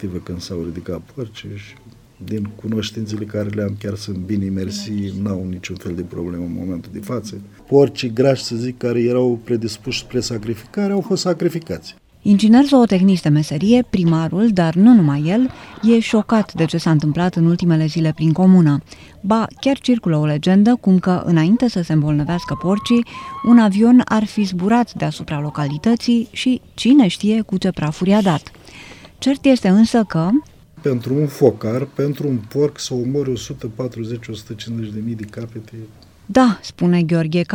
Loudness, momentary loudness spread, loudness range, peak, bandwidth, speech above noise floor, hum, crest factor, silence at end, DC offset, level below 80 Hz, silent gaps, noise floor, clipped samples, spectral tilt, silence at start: -17 LUFS; 15 LU; 10 LU; 0 dBFS; 15 kHz; 23 dB; none; 16 dB; 0 s; under 0.1%; -50 dBFS; none; -39 dBFS; under 0.1%; -7 dB/octave; 0 s